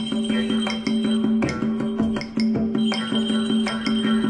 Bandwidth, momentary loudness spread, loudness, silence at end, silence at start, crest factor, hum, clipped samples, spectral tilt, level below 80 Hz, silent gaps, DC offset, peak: 10 kHz; 3 LU; -22 LUFS; 0 s; 0 s; 12 dB; none; under 0.1%; -5.5 dB/octave; -50 dBFS; none; under 0.1%; -10 dBFS